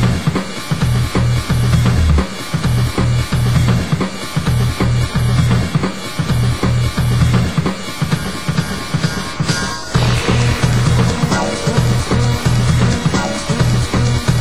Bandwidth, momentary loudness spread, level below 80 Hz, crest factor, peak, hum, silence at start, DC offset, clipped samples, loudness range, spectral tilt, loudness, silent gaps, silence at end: 13.5 kHz; 6 LU; -24 dBFS; 14 dB; -2 dBFS; none; 0 s; 3%; under 0.1%; 2 LU; -5.5 dB/octave; -16 LUFS; none; 0 s